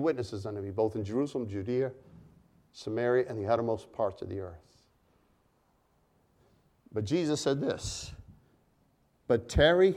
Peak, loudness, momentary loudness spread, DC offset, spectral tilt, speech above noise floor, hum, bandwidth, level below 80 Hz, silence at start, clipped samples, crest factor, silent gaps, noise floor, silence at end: -10 dBFS; -31 LUFS; 12 LU; under 0.1%; -5.5 dB/octave; 40 dB; none; 12.5 kHz; -48 dBFS; 0 s; under 0.1%; 22 dB; none; -70 dBFS; 0 s